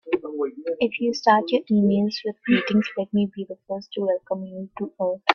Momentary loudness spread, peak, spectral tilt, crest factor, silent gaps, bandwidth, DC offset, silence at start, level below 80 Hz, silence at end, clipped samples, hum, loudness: 13 LU; 0 dBFS; -6.5 dB/octave; 22 dB; none; 6.8 kHz; under 0.1%; 0.05 s; -66 dBFS; 0 s; under 0.1%; none; -24 LUFS